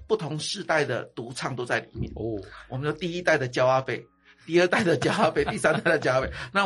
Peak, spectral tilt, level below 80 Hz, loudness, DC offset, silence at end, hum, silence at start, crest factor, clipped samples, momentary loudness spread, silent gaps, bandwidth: -8 dBFS; -5 dB/octave; -50 dBFS; -25 LUFS; under 0.1%; 0 s; none; 0 s; 18 dB; under 0.1%; 11 LU; none; 11.5 kHz